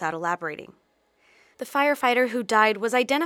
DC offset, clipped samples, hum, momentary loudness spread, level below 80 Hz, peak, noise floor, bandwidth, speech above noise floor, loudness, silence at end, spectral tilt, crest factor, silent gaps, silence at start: under 0.1%; under 0.1%; none; 13 LU; -76 dBFS; -4 dBFS; -63 dBFS; 18 kHz; 40 dB; -23 LUFS; 0 s; -3.5 dB/octave; 20 dB; none; 0 s